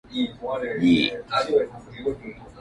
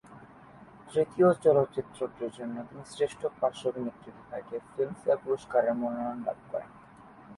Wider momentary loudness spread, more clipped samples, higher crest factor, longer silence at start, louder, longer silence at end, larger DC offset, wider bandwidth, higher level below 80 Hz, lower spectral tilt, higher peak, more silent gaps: about the same, 13 LU vs 15 LU; neither; about the same, 18 dB vs 20 dB; about the same, 0.1 s vs 0.1 s; first, -24 LUFS vs -30 LUFS; about the same, 0 s vs 0 s; neither; about the same, 11 kHz vs 11.5 kHz; first, -52 dBFS vs -68 dBFS; about the same, -6 dB/octave vs -7 dB/octave; first, -6 dBFS vs -12 dBFS; neither